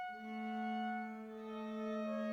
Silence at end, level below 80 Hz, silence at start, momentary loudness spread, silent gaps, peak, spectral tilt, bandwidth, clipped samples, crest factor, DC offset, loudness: 0 s; -82 dBFS; 0 s; 7 LU; none; -30 dBFS; -6.5 dB/octave; 7.2 kHz; under 0.1%; 12 dB; under 0.1%; -43 LUFS